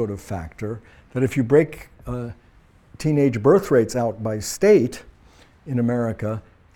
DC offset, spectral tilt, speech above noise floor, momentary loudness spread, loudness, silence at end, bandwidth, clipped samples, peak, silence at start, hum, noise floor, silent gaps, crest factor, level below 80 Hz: under 0.1%; -7 dB/octave; 32 dB; 16 LU; -21 LUFS; 0.35 s; 17.5 kHz; under 0.1%; -4 dBFS; 0 s; none; -53 dBFS; none; 18 dB; -48 dBFS